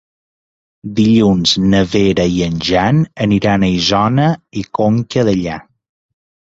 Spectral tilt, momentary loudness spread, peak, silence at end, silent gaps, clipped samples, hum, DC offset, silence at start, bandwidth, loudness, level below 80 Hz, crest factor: -6 dB/octave; 11 LU; -2 dBFS; 0.85 s; none; under 0.1%; none; under 0.1%; 0.85 s; 8 kHz; -14 LUFS; -38 dBFS; 14 dB